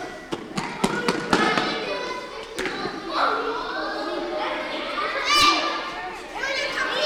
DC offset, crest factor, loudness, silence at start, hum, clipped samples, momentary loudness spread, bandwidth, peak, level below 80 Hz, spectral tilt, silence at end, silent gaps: under 0.1%; 22 dB; -24 LUFS; 0 s; none; under 0.1%; 12 LU; over 20 kHz; -4 dBFS; -52 dBFS; -3 dB/octave; 0 s; none